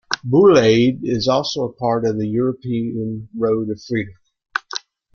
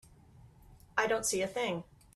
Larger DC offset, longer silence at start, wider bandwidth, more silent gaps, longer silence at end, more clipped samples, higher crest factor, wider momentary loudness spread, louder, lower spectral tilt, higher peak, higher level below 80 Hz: neither; second, 0.1 s vs 0.45 s; second, 7.2 kHz vs 15.5 kHz; neither; about the same, 0.35 s vs 0.35 s; neither; about the same, 18 dB vs 22 dB; first, 15 LU vs 6 LU; first, -18 LUFS vs -33 LUFS; first, -6 dB/octave vs -2.5 dB/octave; first, -2 dBFS vs -14 dBFS; first, -52 dBFS vs -64 dBFS